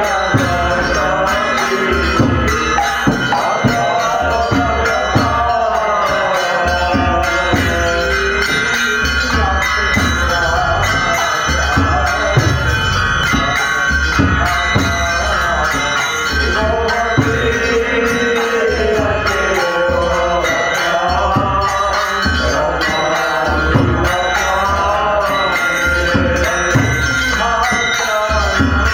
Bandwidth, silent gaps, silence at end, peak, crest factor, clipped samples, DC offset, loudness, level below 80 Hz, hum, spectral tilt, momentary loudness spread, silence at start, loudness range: over 20 kHz; none; 0 s; 0 dBFS; 14 dB; under 0.1%; under 0.1%; -14 LUFS; -26 dBFS; none; -4 dB/octave; 1 LU; 0 s; 1 LU